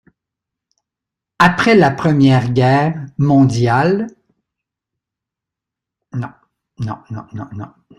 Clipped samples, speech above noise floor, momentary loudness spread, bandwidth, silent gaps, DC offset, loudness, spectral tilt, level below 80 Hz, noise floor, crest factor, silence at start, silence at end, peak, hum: under 0.1%; 70 dB; 18 LU; 11 kHz; none; under 0.1%; -13 LUFS; -7 dB/octave; -50 dBFS; -84 dBFS; 16 dB; 1.4 s; 0.35 s; 0 dBFS; none